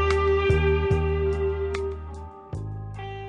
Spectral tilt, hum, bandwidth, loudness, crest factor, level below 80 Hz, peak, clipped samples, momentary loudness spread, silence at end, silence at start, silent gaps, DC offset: -7.5 dB/octave; none; 9.6 kHz; -25 LUFS; 16 dB; -34 dBFS; -8 dBFS; under 0.1%; 15 LU; 0 s; 0 s; none; under 0.1%